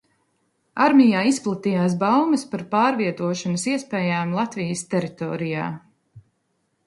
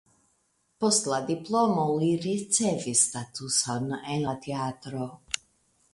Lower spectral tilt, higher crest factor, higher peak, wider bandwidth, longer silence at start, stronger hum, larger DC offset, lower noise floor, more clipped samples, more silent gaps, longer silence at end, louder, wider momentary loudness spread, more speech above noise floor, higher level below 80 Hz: first, -5.5 dB/octave vs -3.5 dB/octave; about the same, 20 dB vs 22 dB; first, -2 dBFS vs -8 dBFS; about the same, 11.5 kHz vs 11.5 kHz; about the same, 0.75 s vs 0.8 s; neither; neither; about the same, -71 dBFS vs -71 dBFS; neither; neither; about the same, 0.65 s vs 0.55 s; first, -21 LUFS vs -27 LUFS; about the same, 11 LU vs 11 LU; first, 50 dB vs 44 dB; about the same, -66 dBFS vs -66 dBFS